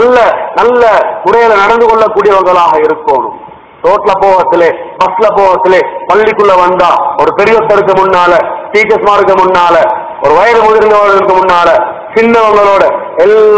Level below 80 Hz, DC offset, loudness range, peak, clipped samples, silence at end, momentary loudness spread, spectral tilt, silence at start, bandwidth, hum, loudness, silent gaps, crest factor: -40 dBFS; 0.5%; 2 LU; 0 dBFS; 9%; 0 s; 5 LU; -5 dB/octave; 0 s; 8 kHz; none; -6 LUFS; none; 6 dB